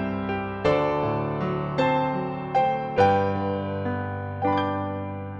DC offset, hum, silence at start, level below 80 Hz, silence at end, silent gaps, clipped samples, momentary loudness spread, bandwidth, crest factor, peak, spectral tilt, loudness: under 0.1%; none; 0 s; -52 dBFS; 0 s; none; under 0.1%; 8 LU; 8 kHz; 18 dB; -8 dBFS; -8 dB/octave; -25 LUFS